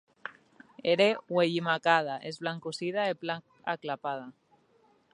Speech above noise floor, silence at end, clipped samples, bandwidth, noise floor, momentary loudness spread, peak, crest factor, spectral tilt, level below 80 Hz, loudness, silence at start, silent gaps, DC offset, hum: 36 dB; 0.8 s; under 0.1%; 11 kHz; -66 dBFS; 15 LU; -8 dBFS; 22 dB; -5 dB/octave; -82 dBFS; -30 LUFS; 0.25 s; none; under 0.1%; none